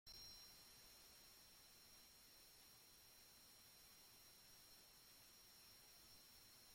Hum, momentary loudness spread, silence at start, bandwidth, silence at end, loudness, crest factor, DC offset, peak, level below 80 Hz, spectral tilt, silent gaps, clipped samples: none; 4 LU; 0.05 s; 16.5 kHz; 0 s; -64 LUFS; 16 dB; under 0.1%; -50 dBFS; -82 dBFS; -1 dB/octave; none; under 0.1%